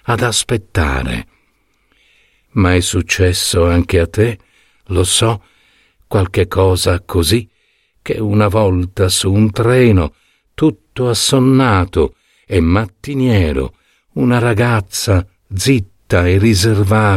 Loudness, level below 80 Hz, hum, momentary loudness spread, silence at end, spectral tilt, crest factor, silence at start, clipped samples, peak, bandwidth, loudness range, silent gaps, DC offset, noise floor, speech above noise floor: -14 LUFS; -30 dBFS; none; 8 LU; 0 s; -5 dB/octave; 14 dB; 0.05 s; under 0.1%; 0 dBFS; 15.5 kHz; 3 LU; none; under 0.1%; -59 dBFS; 46 dB